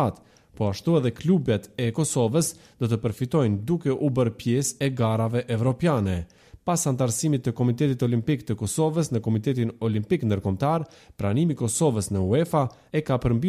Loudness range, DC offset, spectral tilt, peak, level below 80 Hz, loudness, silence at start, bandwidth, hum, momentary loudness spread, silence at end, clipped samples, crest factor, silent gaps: 1 LU; under 0.1%; -6 dB/octave; -10 dBFS; -50 dBFS; -25 LUFS; 0 s; 15 kHz; none; 5 LU; 0 s; under 0.1%; 14 dB; none